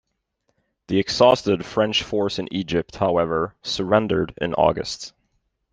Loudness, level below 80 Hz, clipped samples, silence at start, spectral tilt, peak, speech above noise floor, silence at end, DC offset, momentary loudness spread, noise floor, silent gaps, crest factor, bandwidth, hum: -21 LUFS; -50 dBFS; under 0.1%; 0.9 s; -5 dB/octave; -2 dBFS; 52 dB; 0.65 s; under 0.1%; 10 LU; -72 dBFS; none; 20 dB; 9.6 kHz; none